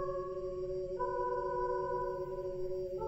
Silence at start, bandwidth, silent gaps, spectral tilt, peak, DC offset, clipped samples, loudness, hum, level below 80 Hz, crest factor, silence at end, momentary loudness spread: 0 s; 8 kHz; none; -8 dB/octave; -24 dBFS; under 0.1%; under 0.1%; -38 LUFS; none; -52 dBFS; 12 dB; 0 s; 4 LU